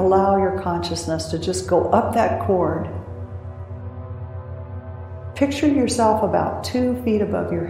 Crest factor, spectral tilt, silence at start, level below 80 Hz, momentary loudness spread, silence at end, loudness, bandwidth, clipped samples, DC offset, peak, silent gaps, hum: 18 dB; -6 dB/octave; 0 s; -48 dBFS; 16 LU; 0 s; -20 LUFS; 15.5 kHz; under 0.1%; under 0.1%; -2 dBFS; none; none